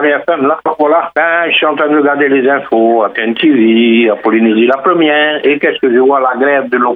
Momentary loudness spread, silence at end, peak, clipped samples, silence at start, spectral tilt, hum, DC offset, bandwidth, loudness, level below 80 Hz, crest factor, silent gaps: 3 LU; 0 s; 0 dBFS; under 0.1%; 0 s; -8 dB/octave; none; under 0.1%; 4 kHz; -10 LUFS; -66 dBFS; 10 dB; none